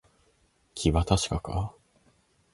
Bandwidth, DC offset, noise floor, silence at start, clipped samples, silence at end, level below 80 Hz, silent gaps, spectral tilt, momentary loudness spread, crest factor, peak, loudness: 11.5 kHz; under 0.1%; -67 dBFS; 0.75 s; under 0.1%; 0.85 s; -38 dBFS; none; -5.5 dB/octave; 12 LU; 22 dB; -8 dBFS; -28 LUFS